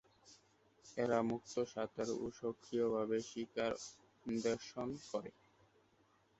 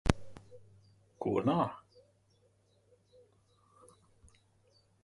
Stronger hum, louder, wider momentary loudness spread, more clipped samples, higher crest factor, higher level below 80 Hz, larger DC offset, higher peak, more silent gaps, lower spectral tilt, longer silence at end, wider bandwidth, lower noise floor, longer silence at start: neither; second, -41 LUFS vs -34 LUFS; second, 10 LU vs 27 LU; neither; second, 22 dB vs 32 dB; second, -74 dBFS vs -50 dBFS; neither; second, -20 dBFS vs -8 dBFS; neither; second, -5 dB/octave vs -6.5 dB/octave; second, 1.1 s vs 3.25 s; second, 8 kHz vs 11.5 kHz; about the same, -73 dBFS vs -70 dBFS; first, 0.25 s vs 0.05 s